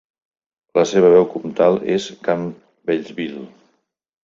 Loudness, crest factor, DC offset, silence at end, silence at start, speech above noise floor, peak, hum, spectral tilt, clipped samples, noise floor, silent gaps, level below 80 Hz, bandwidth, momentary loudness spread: -18 LUFS; 18 dB; under 0.1%; 0.75 s; 0.75 s; 48 dB; -2 dBFS; none; -6 dB/octave; under 0.1%; -65 dBFS; none; -60 dBFS; 7.6 kHz; 16 LU